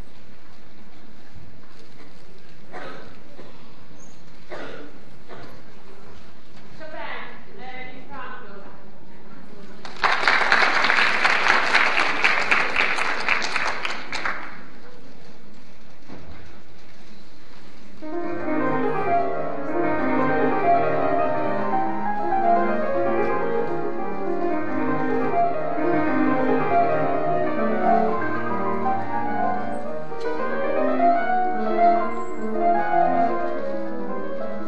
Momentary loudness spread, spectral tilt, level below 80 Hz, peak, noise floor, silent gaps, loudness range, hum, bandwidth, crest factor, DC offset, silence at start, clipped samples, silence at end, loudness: 21 LU; -5 dB/octave; -56 dBFS; 0 dBFS; -49 dBFS; none; 22 LU; none; 11.5 kHz; 24 dB; 7%; 0.85 s; under 0.1%; 0 s; -22 LUFS